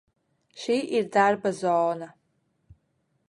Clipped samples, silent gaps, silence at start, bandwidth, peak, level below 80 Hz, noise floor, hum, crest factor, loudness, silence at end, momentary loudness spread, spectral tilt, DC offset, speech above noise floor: under 0.1%; none; 0.55 s; 11.5 kHz; -6 dBFS; -70 dBFS; -72 dBFS; none; 20 dB; -25 LUFS; 1.2 s; 14 LU; -5 dB/octave; under 0.1%; 48 dB